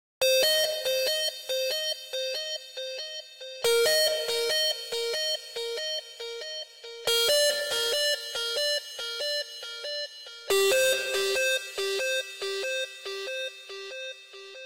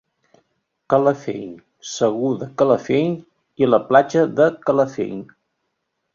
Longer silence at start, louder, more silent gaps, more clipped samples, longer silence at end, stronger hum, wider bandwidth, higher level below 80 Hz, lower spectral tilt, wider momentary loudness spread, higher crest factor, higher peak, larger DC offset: second, 0.2 s vs 0.9 s; second, -27 LUFS vs -19 LUFS; neither; neither; second, 0 s vs 0.9 s; neither; first, 16 kHz vs 7.6 kHz; second, -70 dBFS vs -62 dBFS; second, 1 dB/octave vs -6 dB/octave; about the same, 15 LU vs 16 LU; second, 12 dB vs 18 dB; second, -16 dBFS vs -2 dBFS; neither